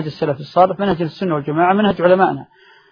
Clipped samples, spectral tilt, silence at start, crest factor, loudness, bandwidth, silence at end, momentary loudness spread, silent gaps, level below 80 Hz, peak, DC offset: under 0.1%; -8.5 dB/octave; 0 s; 16 dB; -16 LUFS; 6.6 kHz; 0.5 s; 8 LU; none; -50 dBFS; 0 dBFS; under 0.1%